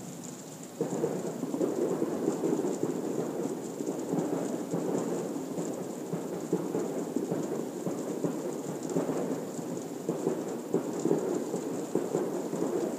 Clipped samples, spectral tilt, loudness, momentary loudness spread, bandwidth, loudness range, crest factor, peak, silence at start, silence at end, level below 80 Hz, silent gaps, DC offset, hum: under 0.1%; -6 dB/octave; -33 LUFS; 6 LU; 15.5 kHz; 2 LU; 20 dB; -12 dBFS; 0 s; 0 s; -80 dBFS; none; under 0.1%; none